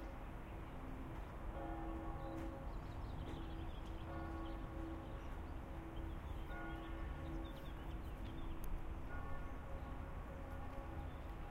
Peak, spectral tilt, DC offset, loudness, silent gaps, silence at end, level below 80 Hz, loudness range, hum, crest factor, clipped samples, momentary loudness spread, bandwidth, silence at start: -32 dBFS; -7.5 dB/octave; under 0.1%; -50 LUFS; none; 0 s; -50 dBFS; 1 LU; none; 14 dB; under 0.1%; 3 LU; 16 kHz; 0 s